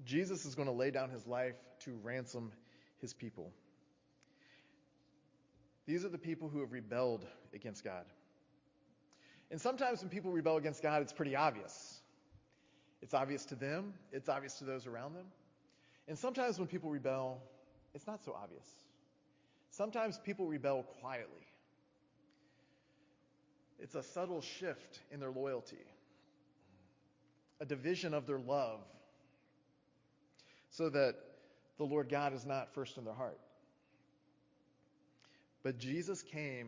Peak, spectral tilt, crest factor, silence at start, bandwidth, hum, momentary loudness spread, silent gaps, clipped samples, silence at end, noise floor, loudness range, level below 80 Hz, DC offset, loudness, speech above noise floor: -20 dBFS; -5.5 dB/octave; 24 dB; 0 s; 7.6 kHz; none; 17 LU; none; under 0.1%; 0 s; -75 dBFS; 9 LU; -84 dBFS; under 0.1%; -41 LUFS; 34 dB